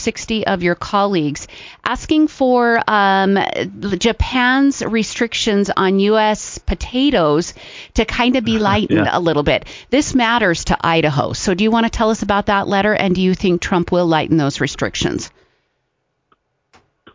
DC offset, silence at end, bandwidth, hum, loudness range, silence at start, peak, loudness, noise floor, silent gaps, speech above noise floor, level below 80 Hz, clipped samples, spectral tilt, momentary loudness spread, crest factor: under 0.1%; 1.85 s; 7.6 kHz; none; 2 LU; 0 s; -2 dBFS; -16 LUFS; -70 dBFS; none; 54 dB; -34 dBFS; under 0.1%; -5 dB/octave; 8 LU; 16 dB